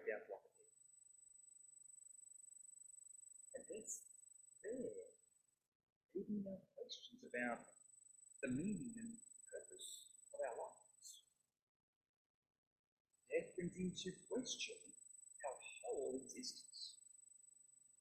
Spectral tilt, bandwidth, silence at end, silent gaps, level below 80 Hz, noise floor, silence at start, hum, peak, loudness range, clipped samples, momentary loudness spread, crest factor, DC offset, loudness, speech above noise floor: -3.5 dB/octave; 15 kHz; 0.1 s; 5.68-6.09 s, 11.62-12.01 s, 12.09-12.42 s, 12.58-13.05 s; -84 dBFS; -79 dBFS; 0 s; none; -30 dBFS; 7 LU; under 0.1%; 17 LU; 24 dB; under 0.1%; -51 LUFS; 31 dB